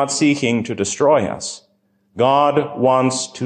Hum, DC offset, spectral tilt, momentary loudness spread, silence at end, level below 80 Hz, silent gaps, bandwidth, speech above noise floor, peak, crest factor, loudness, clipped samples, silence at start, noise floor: none; under 0.1%; -4.5 dB/octave; 10 LU; 0 s; -54 dBFS; none; 10 kHz; 45 dB; -4 dBFS; 14 dB; -17 LUFS; under 0.1%; 0 s; -62 dBFS